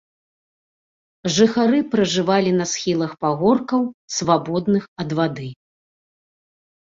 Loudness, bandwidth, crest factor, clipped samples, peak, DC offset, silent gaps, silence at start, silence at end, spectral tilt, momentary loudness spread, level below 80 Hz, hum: -20 LUFS; 7.8 kHz; 18 dB; under 0.1%; -2 dBFS; under 0.1%; 3.94-4.08 s, 4.88-4.96 s; 1.25 s; 1.3 s; -5 dB/octave; 7 LU; -58 dBFS; none